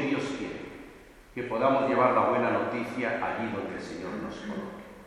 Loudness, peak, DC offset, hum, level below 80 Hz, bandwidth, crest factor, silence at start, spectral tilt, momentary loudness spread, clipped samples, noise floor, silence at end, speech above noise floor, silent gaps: -29 LUFS; -10 dBFS; under 0.1%; none; -60 dBFS; 13.5 kHz; 20 dB; 0 s; -6 dB/octave; 18 LU; under 0.1%; -51 dBFS; 0 s; 23 dB; none